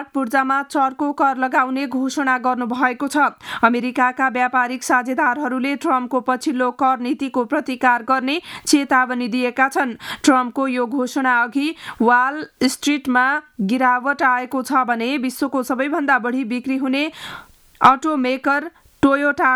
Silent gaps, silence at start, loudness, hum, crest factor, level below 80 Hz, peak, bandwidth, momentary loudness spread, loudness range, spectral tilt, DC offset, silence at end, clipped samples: none; 0 s; -19 LUFS; none; 18 dB; -60 dBFS; 0 dBFS; 17 kHz; 6 LU; 1 LU; -3.5 dB/octave; under 0.1%; 0 s; under 0.1%